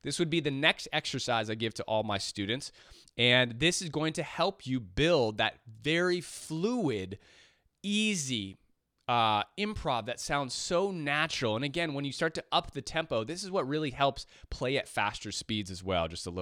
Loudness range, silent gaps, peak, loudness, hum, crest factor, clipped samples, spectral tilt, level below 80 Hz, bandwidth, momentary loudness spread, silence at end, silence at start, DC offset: 4 LU; none; -8 dBFS; -31 LUFS; none; 24 dB; under 0.1%; -4 dB/octave; -56 dBFS; 15.5 kHz; 9 LU; 0 s; 0.05 s; under 0.1%